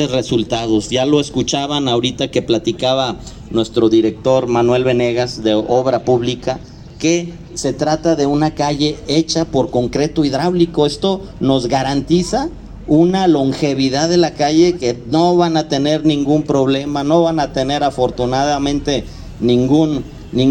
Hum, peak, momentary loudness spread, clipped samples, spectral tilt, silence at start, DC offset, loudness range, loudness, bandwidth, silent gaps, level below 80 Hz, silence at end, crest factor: none; 0 dBFS; 7 LU; under 0.1%; -5.5 dB/octave; 0 s; under 0.1%; 3 LU; -16 LUFS; 9.6 kHz; none; -38 dBFS; 0 s; 14 dB